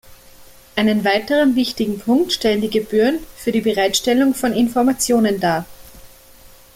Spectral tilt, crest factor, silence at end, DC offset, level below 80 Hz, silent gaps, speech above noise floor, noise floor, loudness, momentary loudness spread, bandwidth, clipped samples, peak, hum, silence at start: -4 dB/octave; 14 dB; 0.3 s; under 0.1%; -48 dBFS; none; 28 dB; -44 dBFS; -17 LUFS; 6 LU; 16.5 kHz; under 0.1%; -4 dBFS; none; 0.1 s